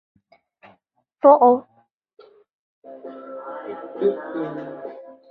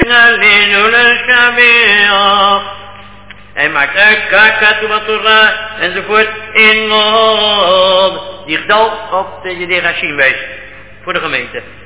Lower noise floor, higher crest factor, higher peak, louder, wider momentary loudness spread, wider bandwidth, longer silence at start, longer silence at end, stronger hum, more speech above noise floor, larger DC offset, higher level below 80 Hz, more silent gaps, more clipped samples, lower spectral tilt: first, -65 dBFS vs -35 dBFS; first, 22 dB vs 10 dB; about the same, -2 dBFS vs 0 dBFS; second, -19 LUFS vs -8 LUFS; first, 24 LU vs 13 LU; first, 4.5 kHz vs 4 kHz; first, 1.25 s vs 0 s; about the same, 0.2 s vs 0.1 s; second, none vs 50 Hz at -40 dBFS; first, 48 dB vs 24 dB; second, under 0.1% vs 1%; second, -74 dBFS vs -40 dBFS; first, 1.92-2.01 s, 2.53-2.82 s vs none; second, under 0.1% vs 1%; first, -10 dB/octave vs -6 dB/octave